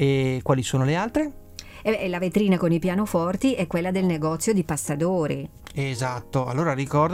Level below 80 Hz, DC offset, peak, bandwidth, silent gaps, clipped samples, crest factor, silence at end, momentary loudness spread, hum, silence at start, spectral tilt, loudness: -48 dBFS; under 0.1%; -8 dBFS; 16.5 kHz; none; under 0.1%; 16 dB; 0 s; 8 LU; none; 0 s; -6 dB/octave; -24 LUFS